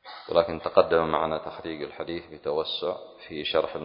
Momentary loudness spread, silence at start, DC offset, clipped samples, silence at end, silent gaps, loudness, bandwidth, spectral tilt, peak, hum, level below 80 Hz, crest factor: 12 LU; 0.05 s; under 0.1%; under 0.1%; 0 s; none; -27 LUFS; 5.4 kHz; -9 dB/octave; -4 dBFS; none; -56 dBFS; 24 dB